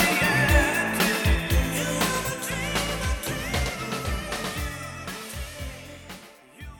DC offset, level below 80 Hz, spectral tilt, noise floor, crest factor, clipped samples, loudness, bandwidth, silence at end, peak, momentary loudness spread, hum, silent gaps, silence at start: under 0.1%; -32 dBFS; -4 dB/octave; -46 dBFS; 20 dB; under 0.1%; -25 LUFS; 19 kHz; 0 s; -6 dBFS; 17 LU; none; none; 0 s